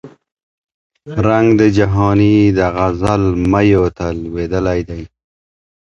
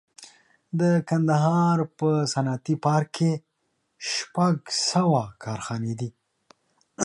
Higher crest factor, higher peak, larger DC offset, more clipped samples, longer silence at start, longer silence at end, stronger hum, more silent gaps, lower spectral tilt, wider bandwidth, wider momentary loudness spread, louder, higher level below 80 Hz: about the same, 14 dB vs 18 dB; first, 0 dBFS vs -8 dBFS; neither; neither; second, 0.05 s vs 0.2 s; first, 0.9 s vs 0 s; neither; first, 0.32-0.37 s, 0.43-0.64 s, 0.74-0.90 s vs none; first, -8 dB/octave vs -5.5 dB/octave; second, 8.4 kHz vs 11.5 kHz; about the same, 11 LU vs 12 LU; first, -14 LUFS vs -24 LUFS; first, -32 dBFS vs -66 dBFS